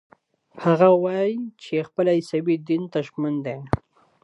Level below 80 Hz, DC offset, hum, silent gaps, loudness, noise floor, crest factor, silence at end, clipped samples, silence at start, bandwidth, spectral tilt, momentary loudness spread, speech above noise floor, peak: -50 dBFS; under 0.1%; none; none; -23 LUFS; -49 dBFS; 22 dB; 0.45 s; under 0.1%; 0.55 s; 11 kHz; -8 dB/octave; 12 LU; 27 dB; -2 dBFS